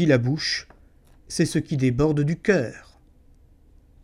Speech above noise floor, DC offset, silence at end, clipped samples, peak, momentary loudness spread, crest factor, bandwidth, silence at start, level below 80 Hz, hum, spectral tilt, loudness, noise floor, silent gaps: 32 dB; under 0.1%; 1.25 s; under 0.1%; -6 dBFS; 8 LU; 18 dB; 13.5 kHz; 0 s; -48 dBFS; none; -6 dB/octave; -23 LUFS; -54 dBFS; none